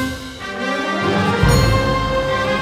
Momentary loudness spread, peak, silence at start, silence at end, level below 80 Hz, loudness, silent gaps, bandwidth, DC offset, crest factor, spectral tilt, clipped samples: 10 LU; -2 dBFS; 0 s; 0 s; -28 dBFS; -17 LUFS; none; 19 kHz; under 0.1%; 16 dB; -5.5 dB/octave; under 0.1%